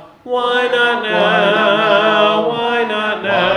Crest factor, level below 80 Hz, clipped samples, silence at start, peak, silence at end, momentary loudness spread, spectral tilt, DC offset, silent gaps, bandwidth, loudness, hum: 12 dB; -60 dBFS; under 0.1%; 0 s; -2 dBFS; 0 s; 5 LU; -5 dB/octave; under 0.1%; none; 10.5 kHz; -14 LUFS; none